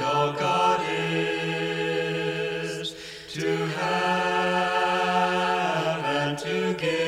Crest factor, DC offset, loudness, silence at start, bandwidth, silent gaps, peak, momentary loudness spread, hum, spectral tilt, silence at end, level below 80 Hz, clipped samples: 14 dB; under 0.1%; -25 LUFS; 0 s; 16 kHz; none; -10 dBFS; 7 LU; none; -4.5 dB/octave; 0 s; -62 dBFS; under 0.1%